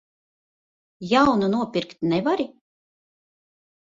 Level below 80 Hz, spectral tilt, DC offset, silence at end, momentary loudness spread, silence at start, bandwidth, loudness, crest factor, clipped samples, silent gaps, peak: -58 dBFS; -6.5 dB/octave; under 0.1%; 1.35 s; 11 LU; 1 s; 7.8 kHz; -22 LUFS; 20 dB; under 0.1%; none; -4 dBFS